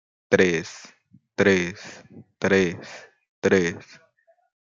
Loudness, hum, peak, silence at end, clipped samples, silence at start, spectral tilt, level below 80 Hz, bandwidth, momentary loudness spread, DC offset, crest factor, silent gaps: -22 LUFS; none; -2 dBFS; 0.8 s; under 0.1%; 0.3 s; -5 dB/octave; -64 dBFS; 7.6 kHz; 21 LU; under 0.1%; 22 dB; 3.29-3.42 s